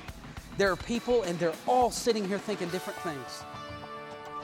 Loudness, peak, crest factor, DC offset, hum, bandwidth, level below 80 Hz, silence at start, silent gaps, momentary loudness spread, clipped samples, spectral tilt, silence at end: -30 LUFS; -14 dBFS; 18 dB; under 0.1%; none; 17 kHz; -54 dBFS; 0 s; none; 15 LU; under 0.1%; -4.5 dB/octave; 0 s